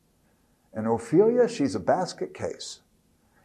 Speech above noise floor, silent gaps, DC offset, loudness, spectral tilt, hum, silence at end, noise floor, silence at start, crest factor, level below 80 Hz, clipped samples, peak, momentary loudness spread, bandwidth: 40 dB; none; under 0.1%; -25 LUFS; -6 dB/octave; none; 0.7 s; -65 dBFS; 0.75 s; 18 dB; -66 dBFS; under 0.1%; -8 dBFS; 18 LU; 11.5 kHz